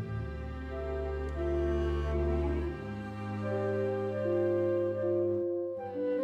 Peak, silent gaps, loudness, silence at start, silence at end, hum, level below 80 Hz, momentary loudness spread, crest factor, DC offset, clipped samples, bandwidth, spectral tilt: -20 dBFS; none; -33 LUFS; 0 s; 0 s; none; -40 dBFS; 9 LU; 12 dB; under 0.1%; under 0.1%; 7.2 kHz; -9 dB/octave